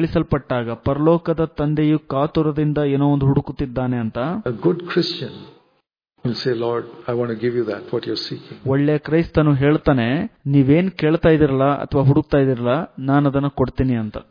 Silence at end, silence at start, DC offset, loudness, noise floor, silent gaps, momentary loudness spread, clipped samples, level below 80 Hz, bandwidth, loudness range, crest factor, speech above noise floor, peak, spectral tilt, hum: 0.1 s; 0 s; under 0.1%; -19 LUFS; -67 dBFS; none; 8 LU; under 0.1%; -40 dBFS; 5.2 kHz; 7 LU; 16 dB; 48 dB; -2 dBFS; -9 dB/octave; none